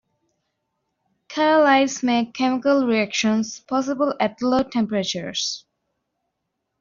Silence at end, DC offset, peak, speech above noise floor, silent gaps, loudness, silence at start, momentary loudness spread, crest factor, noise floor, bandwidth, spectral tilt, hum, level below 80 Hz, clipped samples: 1.2 s; under 0.1%; -6 dBFS; 58 dB; none; -21 LUFS; 1.3 s; 8 LU; 16 dB; -78 dBFS; 7.6 kHz; -3 dB/octave; none; -62 dBFS; under 0.1%